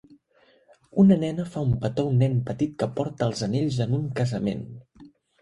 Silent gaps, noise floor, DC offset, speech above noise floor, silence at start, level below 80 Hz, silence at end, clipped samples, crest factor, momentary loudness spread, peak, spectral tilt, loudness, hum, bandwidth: none; -61 dBFS; under 0.1%; 38 dB; 0.95 s; -52 dBFS; 0.35 s; under 0.1%; 18 dB; 11 LU; -8 dBFS; -8 dB/octave; -25 LUFS; none; 11 kHz